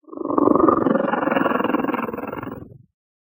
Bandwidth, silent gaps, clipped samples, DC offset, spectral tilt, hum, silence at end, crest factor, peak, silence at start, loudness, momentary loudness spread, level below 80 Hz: 16 kHz; none; under 0.1%; under 0.1%; -9 dB/octave; none; 0.45 s; 20 dB; -2 dBFS; 0.1 s; -20 LUFS; 15 LU; -54 dBFS